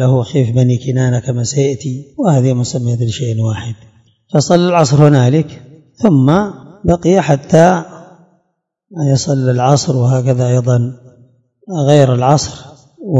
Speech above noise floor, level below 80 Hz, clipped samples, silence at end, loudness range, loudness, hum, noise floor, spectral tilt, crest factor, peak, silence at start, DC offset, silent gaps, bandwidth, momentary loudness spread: 56 dB; -44 dBFS; 0.5%; 0 s; 4 LU; -13 LUFS; none; -68 dBFS; -6.5 dB/octave; 12 dB; 0 dBFS; 0 s; under 0.1%; none; 7.8 kHz; 13 LU